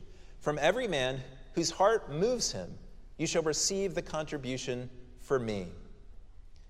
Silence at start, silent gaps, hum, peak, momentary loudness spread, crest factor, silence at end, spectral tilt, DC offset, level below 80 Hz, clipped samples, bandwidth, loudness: 0 s; none; none; -12 dBFS; 13 LU; 22 dB; 0 s; -3.5 dB/octave; under 0.1%; -50 dBFS; under 0.1%; 14.5 kHz; -32 LUFS